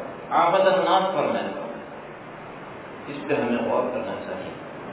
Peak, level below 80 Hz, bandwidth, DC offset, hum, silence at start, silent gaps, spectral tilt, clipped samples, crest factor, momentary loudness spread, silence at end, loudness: -8 dBFS; -62 dBFS; 4 kHz; under 0.1%; none; 0 s; none; -9 dB/octave; under 0.1%; 18 dB; 19 LU; 0 s; -23 LUFS